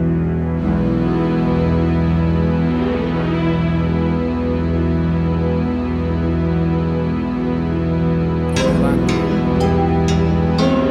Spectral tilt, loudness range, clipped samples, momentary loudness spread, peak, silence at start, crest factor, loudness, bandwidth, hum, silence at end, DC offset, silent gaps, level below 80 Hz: -8 dB/octave; 2 LU; under 0.1%; 4 LU; -4 dBFS; 0 s; 12 dB; -17 LUFS; 9.4 kHz; none; 0 s; under 0.1%; none; -28 dBFS